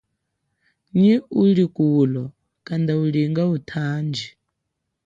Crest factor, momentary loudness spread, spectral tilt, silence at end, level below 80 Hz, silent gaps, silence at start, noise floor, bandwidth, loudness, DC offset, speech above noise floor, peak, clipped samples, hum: 14 dB; 12 LU; -8.5 dB/octave; 0.75 s; -62 dBFS; none; 0.95 s; -78 dBFS; 7.6 kHz; -20 LUFS; under 0.1%; 59 dB; -6 dBFS; under 0.1%; none